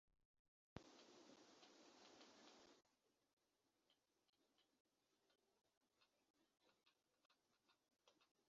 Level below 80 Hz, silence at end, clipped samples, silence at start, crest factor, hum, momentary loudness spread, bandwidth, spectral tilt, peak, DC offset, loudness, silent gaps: -90 dBFS; 0 s; under 0.1%; 0.05 s; 36 dB; none; 4 LU; 7.4 kHz; -3.5 dB/octave; -38 dBFS; under 0.1%; -68 LUFS; 0.25-0.76 s, 3.33-3.37 s, 4.29-4.33 s, 4.80-4.85 s, 5.77-5.81 s, 6.30-6.34 s, 7.26-7.30 s, 8.31-8.35 s